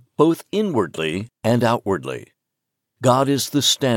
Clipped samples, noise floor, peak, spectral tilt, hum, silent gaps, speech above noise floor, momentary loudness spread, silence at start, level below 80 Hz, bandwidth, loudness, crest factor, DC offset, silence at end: under 0.1%; -80 dBFS; -2 dBFS; -4.5 dB/octave; none; none; 61 dB; 8 LU; 0.2 s; -64 dBFS; 17 kHz; -20 LUFS; 18 dB; under 0.1%; 0 s